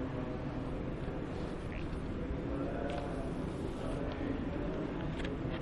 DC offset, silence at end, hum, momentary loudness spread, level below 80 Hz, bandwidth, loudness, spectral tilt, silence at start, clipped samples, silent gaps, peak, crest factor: under 0.1%; 0 s; none; 3 LU; -44 dBFS; 11.5 kHz; -39 LUFS; -7.5 dB/octave; 0 s; under 0.1%; none; -24 dBFS; 14 dB